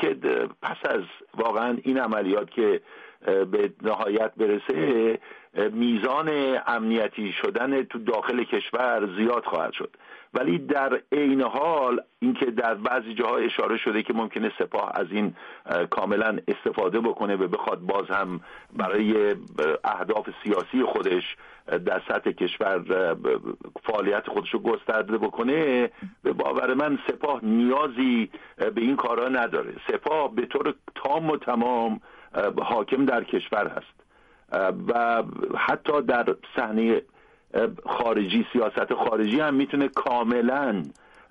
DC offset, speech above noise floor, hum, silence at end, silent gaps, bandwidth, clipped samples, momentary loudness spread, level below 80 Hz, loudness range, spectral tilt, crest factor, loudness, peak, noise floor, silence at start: under 0.1%; 33 dB; none; 0.4 s; none; 6.6 kHz; under 0.1%; 6 LU; -66 dBFS; 2 LU; -7.5 dB/octave; 14 dB; -25 LUFS; -12 dBFS; -58 dBFS; 0 s